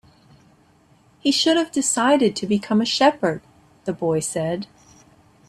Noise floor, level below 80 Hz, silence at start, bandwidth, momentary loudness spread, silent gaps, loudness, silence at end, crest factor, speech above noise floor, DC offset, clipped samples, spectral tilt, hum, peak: -56 dBFS; -62 dBFS; 1.25 s; 13.5 kHz; 13 LU; none; -20 LUFS; 0.85 s; 18 dB; 36 dB; under 0.1%; under 0.1%; -3.5 dB/octave; none; -4 dBFS